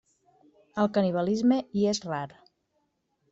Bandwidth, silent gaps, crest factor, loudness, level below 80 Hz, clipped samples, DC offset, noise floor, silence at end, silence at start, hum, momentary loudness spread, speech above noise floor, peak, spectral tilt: 7.8 kHz; none; 16 dB; -27 LUFS; -68 dBFS; under 0.1%; under 0.1%; -75 dBFS; 1.05 s; 0.75 s; none; 11 LU; 49 dB; -12 dBFS; -6 dB/octave